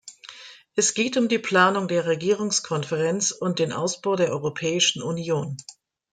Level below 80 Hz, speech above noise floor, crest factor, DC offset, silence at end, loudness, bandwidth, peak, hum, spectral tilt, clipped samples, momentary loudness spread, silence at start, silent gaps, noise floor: -68 dBFS; 22 dB; 18 dB; under 0.1%; 0.4 s; -23 LUFS; 10 kHz; -6 dBFS; none; -3.5 dB/octave; under 0.1%; 12 LU; 0.05 s; none; -45 dBFS